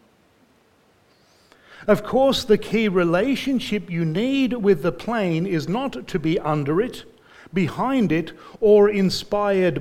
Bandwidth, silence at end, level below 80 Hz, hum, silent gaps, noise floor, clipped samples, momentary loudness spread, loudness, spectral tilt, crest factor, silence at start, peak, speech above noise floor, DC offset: 15.5 kHz; 0 s; -48 dBFS; none; none; -59 dBFS; under 0.1%; 8 LU; -21 LUFS; -6.5 dB/octave; 18 dB; 1.7 s; -4 dBFS; 38 dB; under 0.1%